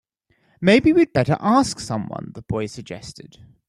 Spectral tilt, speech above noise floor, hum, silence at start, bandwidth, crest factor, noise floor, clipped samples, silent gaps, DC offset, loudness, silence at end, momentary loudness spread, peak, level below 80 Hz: -6 dB/octave; 44 dB; none; 0.6 s; 12 kHz; 20 dB; -64 dBFS; under 0.1%; none; under 0.1%; -19 LUFS; 0.4 s; 19 LU; -2 dBFS; -50 dBFS